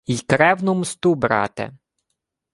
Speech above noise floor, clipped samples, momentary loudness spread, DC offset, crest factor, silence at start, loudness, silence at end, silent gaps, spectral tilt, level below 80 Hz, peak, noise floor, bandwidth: 59 dB; under 0.1%; 12 LU; under 0.1%; 20 dB; 0.1 s; -19 LUFS; 0.85 s; none; -5.5 dB/octave; -54 dBFS; -2 dBFS; -78 dBFS; 11.5 kHz